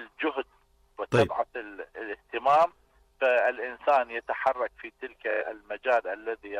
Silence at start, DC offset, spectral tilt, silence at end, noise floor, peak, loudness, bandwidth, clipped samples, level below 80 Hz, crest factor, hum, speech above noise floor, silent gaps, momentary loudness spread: 0 s; under 0.1%; -6 dB/octave; 0 s; -64 dBFS; -12 dBFS; -28 LUFS; 11.5 kHz; under 0.1%; -62 dBFS; 16 dB; none; 35 dB; none; 15 LU